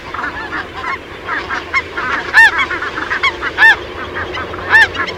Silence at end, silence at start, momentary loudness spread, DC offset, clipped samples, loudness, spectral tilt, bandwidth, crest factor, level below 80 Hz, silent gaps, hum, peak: 0 s; 0 s; 14 LU; under 0.1%; 0.2%; -13 LUFS; -3 dB/octave; 16.5 kHz; 16 dB; -40 dBFS; none; none; 0 dBFS